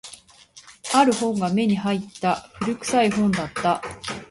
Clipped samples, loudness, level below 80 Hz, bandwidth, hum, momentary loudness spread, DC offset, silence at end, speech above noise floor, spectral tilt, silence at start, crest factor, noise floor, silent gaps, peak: under 0.1%; -22 LUFS; -56 dBFS; 11.5 kHz; none; 11 LU; under 0.1%; 0.05 s; 28 dB; -5 dB/octave; 0.05 s; 18 dB; -50 dBFS; none; -6 dBFS